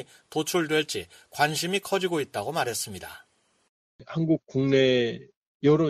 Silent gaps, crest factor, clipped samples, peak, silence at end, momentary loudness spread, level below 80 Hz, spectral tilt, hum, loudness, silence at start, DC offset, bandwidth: 3.69-3.99 s, 5.36-5.60 s; 20 dB; under 0.1%; -8 dBFS; 0 s; 13 LU; -64 dBFS; -4.5 dB/octave; none; -26 LUFS; 0 s; under 0.1%; 15 kHz